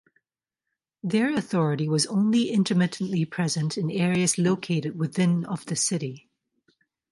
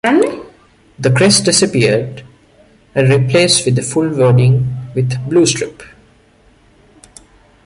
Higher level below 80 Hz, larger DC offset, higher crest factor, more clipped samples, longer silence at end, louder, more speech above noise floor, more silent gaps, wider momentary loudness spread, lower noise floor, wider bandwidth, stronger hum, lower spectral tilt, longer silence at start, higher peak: second, -68 dBFS vs -46 dBFS; neither; about the same, 14 dB vs 14 dB; neither; second, 0.95 s vs 1.8 s; second, -25 LUFS vs -13 LUFS; first, 64 dB vs 37 dB; neither; second, 6 LU vs 11 LU; first, -88 dBFS vs -49 dBFS; about the same, 11.5 kHz vs 11.5 kHz; neither; about the same, -5 dB/octave vs -4.5 dB/octave; first, 1.05 s vs 0.05 s; second, -10 dBFS vs 0 dBFS